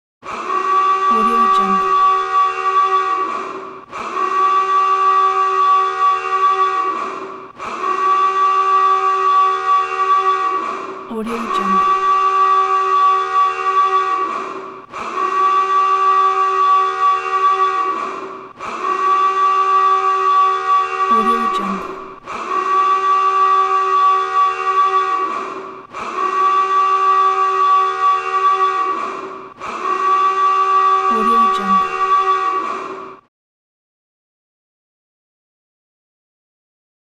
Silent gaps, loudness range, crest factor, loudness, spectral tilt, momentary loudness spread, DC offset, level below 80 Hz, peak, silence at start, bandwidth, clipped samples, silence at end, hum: none; 1 LU; 12 dB; -15 LUFS; -3.5 dB/octave; 13 LU; under 0.1%; -58 dBFS; -6 dBFS; 0.25 s; 9.2 kHz; under 0.1%; 3.9 s; none